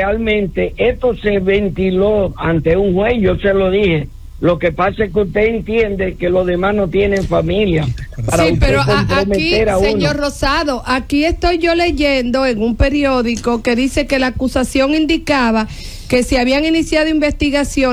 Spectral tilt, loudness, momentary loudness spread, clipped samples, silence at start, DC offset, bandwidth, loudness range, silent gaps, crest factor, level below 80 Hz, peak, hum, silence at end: -5.5 dB/octave; -15 LUFS; 4 LU; under 0.1%; 0 s; under 0.1%; 15.5 kHz; 1 LU; none; 14 dB; -26 dBFS; -2 dBFS; none; 0 s